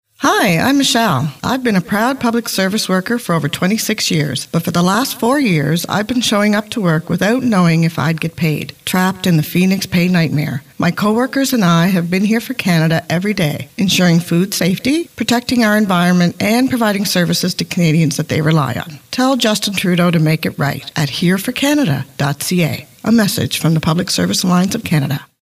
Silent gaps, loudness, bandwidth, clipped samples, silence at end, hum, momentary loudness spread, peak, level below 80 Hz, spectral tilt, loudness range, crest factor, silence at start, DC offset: none; -15 LUFS; 16 kHz; under 0.1%; 0.35 s; none; 6 LU; -2 dBFS; -50 dBFS; -5 dB/octave; 2 LU; 12 dB; 0.2 s; under 0.1%